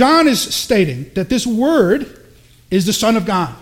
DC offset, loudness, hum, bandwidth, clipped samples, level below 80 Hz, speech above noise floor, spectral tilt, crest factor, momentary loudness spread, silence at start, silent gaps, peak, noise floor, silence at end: under 0.1%; -15 LUFS; none; 16.5 kHz; under 0.1%; -44 dBFS; 31 dB; -4.5 dB/octave; 16 dB; 7 LU; 0 s; none; 0 dBFS; -46 dBFS; 0.05 s